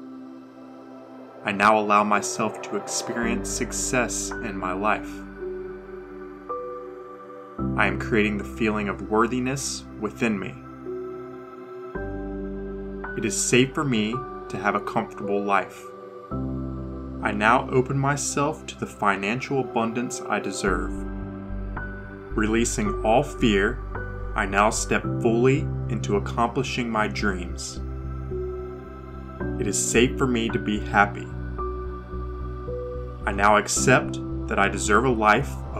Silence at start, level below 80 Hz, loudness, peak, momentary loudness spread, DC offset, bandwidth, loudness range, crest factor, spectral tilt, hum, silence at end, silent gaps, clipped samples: 0 s; -38 dBFS; -25 LUFS; -2 dBFS; 17 LU; under 0.1%; 16 kHz; 5 LU; 24 dB; -4.5 dB/octave; none; 0 s; none; under 0.1%